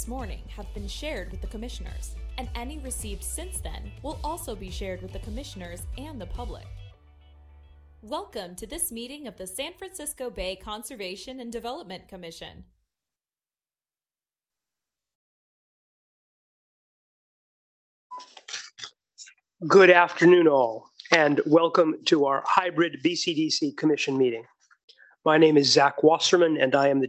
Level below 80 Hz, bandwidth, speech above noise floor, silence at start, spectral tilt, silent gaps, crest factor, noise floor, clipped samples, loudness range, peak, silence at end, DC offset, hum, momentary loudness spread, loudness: -44 dBFS; 16 kHz; over 65 dB; 0 s; -4 dB/octave; 15.15-18.10 s, 24.84-24.88 s; 22 dB; under -90 dBFS; under 0.1%; 20 LU; -4 dBFS; 0 s; under 0.1%; none; 21 LU; -23 LUFS